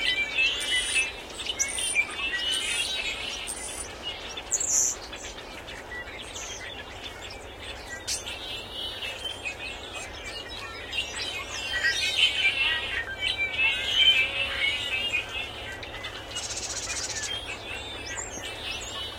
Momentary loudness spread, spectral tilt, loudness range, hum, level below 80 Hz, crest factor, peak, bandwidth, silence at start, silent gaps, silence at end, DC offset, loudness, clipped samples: 15 LU; 0 dB/octave; 11 LU; none; -50 dBFS; 22 dB; -8 dBFS; 16.5 kHz; 0 s; none; 0 s; under 0.1%; -27 LUFS; under 0.1%